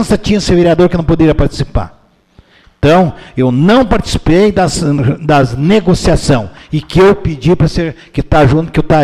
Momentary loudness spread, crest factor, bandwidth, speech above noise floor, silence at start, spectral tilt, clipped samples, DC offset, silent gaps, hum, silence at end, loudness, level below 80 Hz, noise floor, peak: 9 LU; 10 dB; 12.5 kHz; 36 dB; 0 s; -6.5 dB/octave; under 0.1%; under 0.1%; none; none; 0 s; -11 LUFS; -24 dBFS; -45 dBFS; 0 dBFS